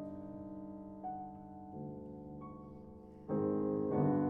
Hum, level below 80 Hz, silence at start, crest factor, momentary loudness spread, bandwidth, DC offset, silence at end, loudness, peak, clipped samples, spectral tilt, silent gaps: none; -66 dBFS; 0 s; 18 dB; 17 LU; 2.6 kHz; under 0.1%; 0 s; -41 LUFS; -22 dBFS; under 0.1%; -12.5 dB/octave; none